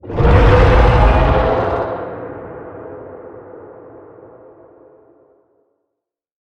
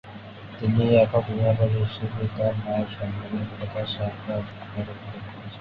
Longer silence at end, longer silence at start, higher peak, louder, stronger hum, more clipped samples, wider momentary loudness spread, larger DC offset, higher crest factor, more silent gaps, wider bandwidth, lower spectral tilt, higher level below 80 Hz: first, 2.75 s vs 0 s; about the same, 0.05 s vs 0.05 s; first, 0 dBFS vs -6 dBFS; first, -13 LUFS vs -26 LUFS; neither; neither; first, 25 LU vs 18 LU; neither; about the same, 16 dB vs 20 dB; neither; first, 6.6 kHz vs 5 kHz; second, -8 dB/octave vs -10 dB/octave; first, -20 dBFS vs -48 dBFS